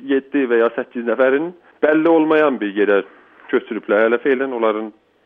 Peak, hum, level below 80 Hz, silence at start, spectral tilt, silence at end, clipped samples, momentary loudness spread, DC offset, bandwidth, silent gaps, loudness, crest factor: -4 dBFS; none; -70 dBFS; 0 s; -8 dB/octave; 0.35 s; under 0.1%; 8 LU; under 0.1%; 3.9 kHz; none; -17 LUFS; 14 dB